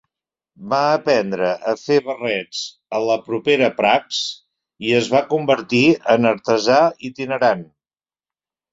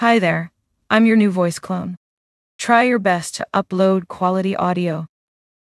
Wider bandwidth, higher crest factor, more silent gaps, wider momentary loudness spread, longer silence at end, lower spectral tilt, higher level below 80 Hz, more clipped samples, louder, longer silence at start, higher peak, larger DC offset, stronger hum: second, 7.8 kHz vs 12 kHz; about the same, 18 dB vs 18 dB; second, none vs 1.97-2.59 s; second, 10 LU vs 14 LU; first, 1.1 s vs 0.6 s; about the same, -4.5 dB/octave vs -5.5 dB/octave; about the same, -62 dBFS vs -62 dBFS; neither; about the same, -18 LUFS vs -18 LUFS; first, 0.6 s vs 0 s; about the same, -2 dBFS vs 0 dBFS; neither; neither